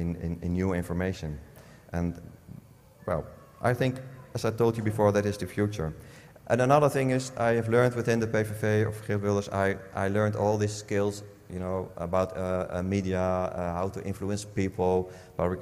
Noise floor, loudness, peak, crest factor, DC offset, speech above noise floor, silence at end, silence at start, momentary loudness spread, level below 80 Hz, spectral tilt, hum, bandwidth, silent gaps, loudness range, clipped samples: -52 dBFS; -28 LUFS; -8 dBFS; 20 dB; under 0.1%; 24 dB; 0 s; 0 s; 13 LU; -54 dBFS; -6.5 dB/octave; none; 15.5 kHz; none; 7 LU; under 0.1%